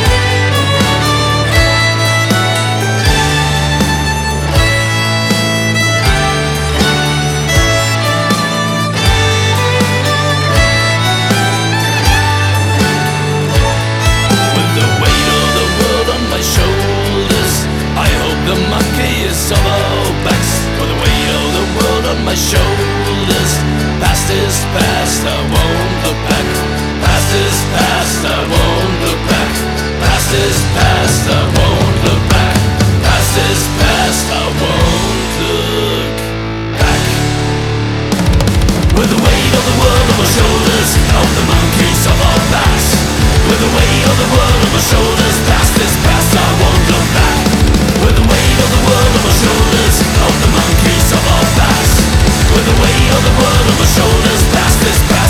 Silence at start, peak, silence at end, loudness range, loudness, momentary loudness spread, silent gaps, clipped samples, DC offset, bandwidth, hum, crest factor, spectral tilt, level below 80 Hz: 0 s; 0 dBFS; 0 s; 3 LU; -11 LUFS; 4 LU; none; under 0.1%; under 0.1%; 17.5 kHz; none; 10 dB; -4 dB/octave; -18 dBFS